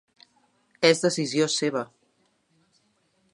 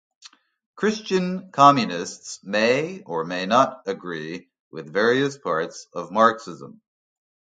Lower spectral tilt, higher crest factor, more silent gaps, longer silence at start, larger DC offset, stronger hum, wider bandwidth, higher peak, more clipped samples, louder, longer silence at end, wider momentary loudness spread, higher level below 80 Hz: about the same, -3.5 dB/octave vs -4.5 dB/octave; about the same, 24 dB vs 22 dB; second, none vs 4.60-4.71 s; about the same, 0.8 s vs 0.75 s; neither; neither; first, 11.5 kHz vs 9.4 kHz; second, -4 dBFS vs 0 dBFS; neither; about the same, -24 LUFS vs -22 LUFS; first, 1.5 s vs 0.85 s; second, 11 LU vs 19 LU; about the same, -76 dBFS vs -72 dBFS